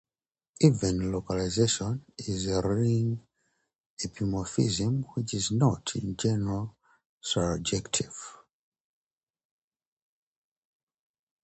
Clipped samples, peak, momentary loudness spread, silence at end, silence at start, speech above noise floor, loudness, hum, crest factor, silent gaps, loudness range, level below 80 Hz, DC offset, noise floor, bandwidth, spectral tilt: under 0.1%; -8 dBFS; 12 LU; 3.1 s; 0.6 s; over 62 dB; -29 LUFS; none; 22 dB; 3.80-3.97 s, 7.06-7.21 s; 6 LU; -50 dBFS; under 0.1%; under -90 dBFS; 9 kHz; -5.5 dB/octave